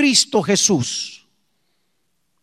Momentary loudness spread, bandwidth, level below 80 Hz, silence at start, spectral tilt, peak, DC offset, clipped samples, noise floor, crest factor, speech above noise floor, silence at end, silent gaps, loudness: 12 LU; 15 kHz; -62 dBFS; 0 s; -2.5 dB/octave; -2 dBFS; under 0.1%; under 0.1%; -72 dBFS; 18 dB; 54 dB; 1.25 s; none; -17 LUFS